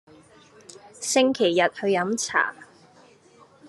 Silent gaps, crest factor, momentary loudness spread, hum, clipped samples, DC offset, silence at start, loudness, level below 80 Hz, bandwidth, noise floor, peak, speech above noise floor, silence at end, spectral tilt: none; 20 dB; 5 LU; none; under 0.1%; under 0.1%; 1 s; -23 LUFS; -74 dBFS; 12.5 kHz; -54 dBFS; -6 dBFS; 32 dB; 0 s; -3 dB/octave